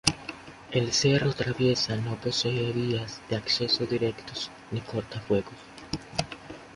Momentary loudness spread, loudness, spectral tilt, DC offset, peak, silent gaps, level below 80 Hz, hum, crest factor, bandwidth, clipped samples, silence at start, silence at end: 14 LU; -28 LUFS; -4.5 dB/octave; under 0.1%; -2 dBFS; none; -54 dBFS; none; 26 dB; 11.5 kHz; under 0.1%; 0.05 s; 0 s